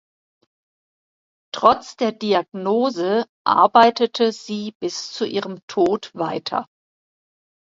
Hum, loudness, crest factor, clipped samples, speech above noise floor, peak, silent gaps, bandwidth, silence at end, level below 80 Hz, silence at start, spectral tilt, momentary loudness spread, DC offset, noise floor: none; -20 LUFS; 22 dB; under 0.1%; over 71 dB; 0 dBFS; 3.29-3.45 s, 4.75-4.80 s, 5.63-5.68 s; 7.8 kHz; 1.1 s; -64 dBFS; 1.55 s; -4.5 dB/octave; 13 LU; under 0.1%; under -90 dBFS